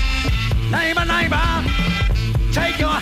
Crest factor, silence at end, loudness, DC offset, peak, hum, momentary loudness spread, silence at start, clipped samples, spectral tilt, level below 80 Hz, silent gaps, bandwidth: 10 dB; 0 s; -19 LUFS; under 0.1%; -8 dBFS; none; 3 LU; 0 s; under 0.1%; -5 dB/octave; -22 dBFS; none; 15 kHz